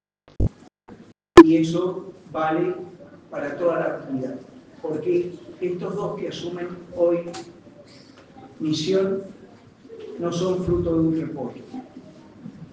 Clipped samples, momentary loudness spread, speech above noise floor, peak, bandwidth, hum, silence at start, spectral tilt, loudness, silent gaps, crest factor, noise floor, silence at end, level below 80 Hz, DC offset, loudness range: 0.2%; 18 LU; 24 dB; 0 dBFS; 9.2 kHz; none; 0.4 s; -6.5 dB/octave; -22 LUFS; none; 24 dB; -48 dBFS; 0.05 s; -44 dBFS; under 0.1%; 9 LU